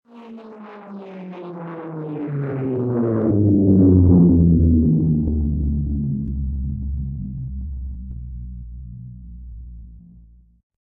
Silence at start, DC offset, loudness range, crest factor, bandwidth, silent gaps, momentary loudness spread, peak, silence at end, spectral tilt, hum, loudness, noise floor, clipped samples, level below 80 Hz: 0.15 s; under 0.1%; 17 LU; 18 dB; 3 kHz; none; 25 LU; -2 dBFS; 0.85 s; -14 dB/octave; none; -19 LUFS; -48 dBFS; under 0.1%; -30 dBFS